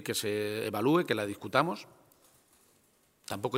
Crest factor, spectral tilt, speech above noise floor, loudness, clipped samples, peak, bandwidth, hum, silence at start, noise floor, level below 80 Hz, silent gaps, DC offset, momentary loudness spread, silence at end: 24 dB; -4.5 dB/octave; 37 dB; -31 LUFS; under 0.1%; -8 dBFS; 16 kHz; none; 0 s; -68 dBFS; -74 dBFS; none; under 0.1%; 14 LU; 0 s